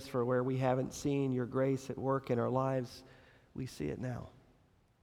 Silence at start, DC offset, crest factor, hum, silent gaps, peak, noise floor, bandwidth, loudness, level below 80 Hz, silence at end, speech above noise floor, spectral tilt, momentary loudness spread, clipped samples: 0 s; under 0.1%; 16 dB; none; none; -18 dBFS; -69 dBFS; 14.5 kHz; -35 LUFS; -64 dBFS; 0.75 s; 34 dB; -7 dB/octave; 14 LU; under 0.1%